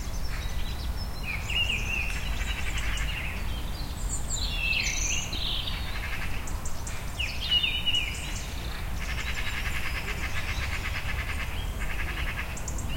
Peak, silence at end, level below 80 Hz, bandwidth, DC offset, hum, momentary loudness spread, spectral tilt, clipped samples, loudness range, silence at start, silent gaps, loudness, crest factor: -14 dBFS; 0 s; -34 dBFS; 16.5 kHz; 0.1%; none; 9 LU; -2.5 dB/octave; under 0.1%; 3 LU; 0 s; none; -30 LUFS; 16 dB